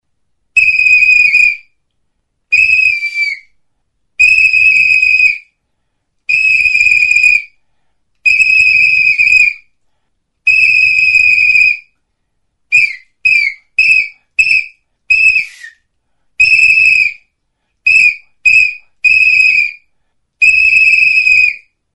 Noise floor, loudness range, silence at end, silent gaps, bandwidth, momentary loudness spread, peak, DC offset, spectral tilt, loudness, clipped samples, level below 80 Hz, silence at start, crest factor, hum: -67 dBFS; 3 LU; 0.35 s; none; 11 kHz; 9 LU; 0 dBFS; under 0.1%; 1.5 dB/octave; -7 LUFS; under 0.1%; -46 dBFS; 0.55 s; 12 dB; none